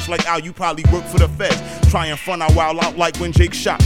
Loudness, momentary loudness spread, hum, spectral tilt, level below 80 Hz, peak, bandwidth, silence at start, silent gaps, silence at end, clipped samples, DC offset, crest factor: -17 LUFS; 5 LU; none; -5.5 dB/octave; -22 dBFS; 0 dBFS; 15 kHz; 0 s; none; 0 s; under 0.1%; 0.9%; 16 dB